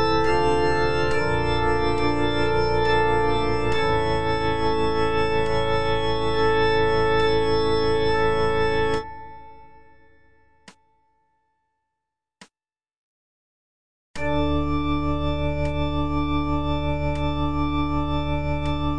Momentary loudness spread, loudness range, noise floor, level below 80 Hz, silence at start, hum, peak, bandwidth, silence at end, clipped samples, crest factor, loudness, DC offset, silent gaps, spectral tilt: 5 LU; 8 LU; under -90 dBFS; -34 dBFS; 0 s; none; -8 dBFS; 9.8 kHz; 0 s; under 0.1%; 14 dB; -23 LUFS; under 0.1%; 12.97-14.14 s; -6.5 dB/octave